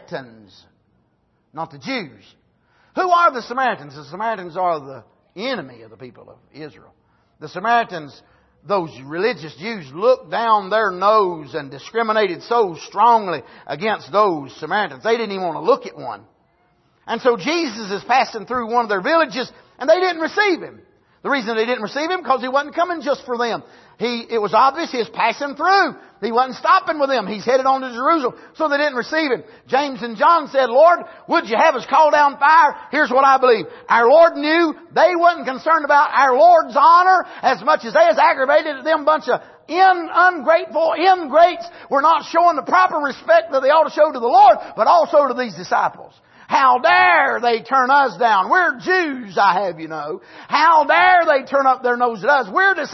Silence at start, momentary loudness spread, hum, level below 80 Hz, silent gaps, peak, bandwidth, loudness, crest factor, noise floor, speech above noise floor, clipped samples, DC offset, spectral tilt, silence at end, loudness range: 0.1 s; 14 LU; none; -66 dBFS; none; -2 dBFS; 6.2 kHz; -16 LUFS; 16 dB; -64 dBFS; 47 dB; under 0.1%; under 0.1%; -4.5 dB/octave; 0 s; 8 LU